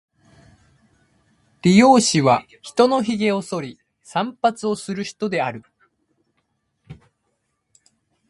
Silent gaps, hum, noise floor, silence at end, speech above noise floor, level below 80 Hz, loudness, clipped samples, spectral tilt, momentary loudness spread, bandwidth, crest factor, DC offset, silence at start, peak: none; none; -72 dBFS; 1.35 s; 54 dB; -60 dBFS; -19 LUFS; under 0.1%; -5 dB/octave; 15 LU; 11.5 kHz; 22 dB; under 0.1%; 1.65 s; 0 dBFS